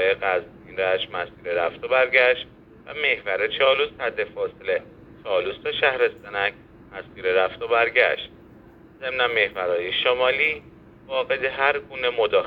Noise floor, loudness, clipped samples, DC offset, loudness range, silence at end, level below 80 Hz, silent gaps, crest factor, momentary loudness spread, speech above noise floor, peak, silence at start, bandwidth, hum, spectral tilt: -48 dBFS; -22 LUFS; under 0.1%; under 0.1%; 3 LU; 0 s; -58 dBFS; none; 22 dB; 11 LU; 25 dB; -2 dBFS; 0 s; 5.4 kHz; none; -5.5 dB/octave